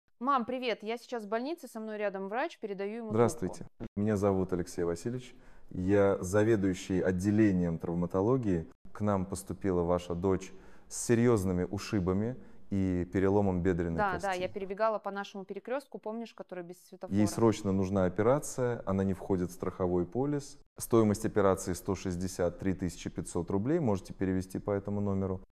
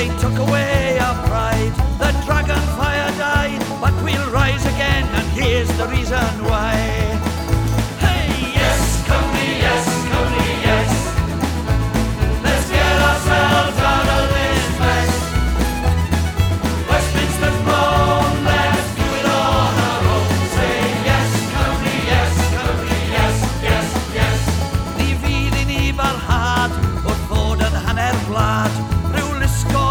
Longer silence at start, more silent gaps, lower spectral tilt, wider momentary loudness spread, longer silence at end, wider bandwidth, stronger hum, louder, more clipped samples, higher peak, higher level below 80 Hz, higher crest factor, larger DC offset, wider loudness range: first, 0.2 s vs 0 s; first, 3.88-3.96 s, 8.75-8.85 s, 20.66-20.76 s vs none; first, -6.5 dB/octave vs -5 dB/octave; first, 12 LU vs 4 LU; about the same, 0.1 s vs 0 s; second, 15 kHz vs 19 kHz; neither; second, -32 LUFS vs -17 LUFS; neither; second, -12 dBFS vs -2 dBFS; second, -58 dBFS vs -24 dBFS; first, 20 dB vs 14 dB; neither; about the same, 4 LU vs 2 LU